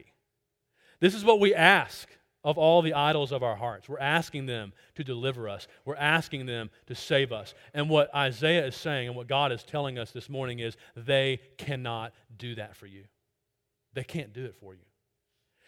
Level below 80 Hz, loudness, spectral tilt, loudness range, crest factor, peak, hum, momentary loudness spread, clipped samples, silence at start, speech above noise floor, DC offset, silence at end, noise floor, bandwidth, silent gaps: -68 dBFS; -27 LUFS; -5.5 dB/octave; 15 LU; 26 dB; -4 dBFS; none; 18 LU; under 0.1%; 1 s; 54 dB; under 0.1%; 0.95 s; -82 dBFS; 16.5 kHz; none